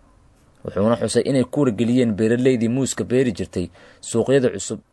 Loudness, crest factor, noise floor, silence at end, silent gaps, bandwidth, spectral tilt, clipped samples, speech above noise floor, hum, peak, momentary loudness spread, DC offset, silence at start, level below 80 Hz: -20 LUFS; 16 dB; -53 dBFS; 0.15 s; none; 12 kHz; -6 dB/octave; under 0.1%; 34 dB; none; -4 dBFS; 11 LU; under 0.1%; 0.65 s; -56 dBFS